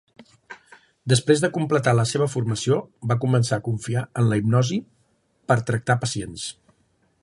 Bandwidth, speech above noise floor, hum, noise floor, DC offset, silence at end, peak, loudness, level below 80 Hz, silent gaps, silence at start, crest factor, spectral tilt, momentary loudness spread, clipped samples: 11.5 kHz; 43 dB; none; -65 dBFS; under 0.1%; 0.7 s; -4 dBFS; -22 LUFS; -56 dBFS; none; 0.2 s; 20 dB; -5.5 dB/octave; 13 LU; under 0.1%